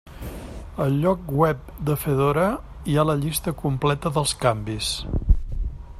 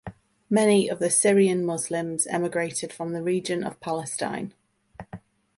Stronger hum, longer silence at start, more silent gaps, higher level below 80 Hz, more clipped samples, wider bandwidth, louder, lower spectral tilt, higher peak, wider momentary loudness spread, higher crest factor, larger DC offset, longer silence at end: neither; about the same, 0.05 s vs 0.05 s; neither; first, -32 dBFS vs -64 dBFS; neither; first, 15 kHz vs 12 kHz; about the same, -23 LUFS vs -24 LUFS; first, -5.5 dB/octave vs -4 dB/octave; about the same, -4 dBFS vs -6 dBFS; second, 12 LU vs 21 LU; about the same, 20 dB vs 20 dB; neither; second, 0 s vs 0.4 s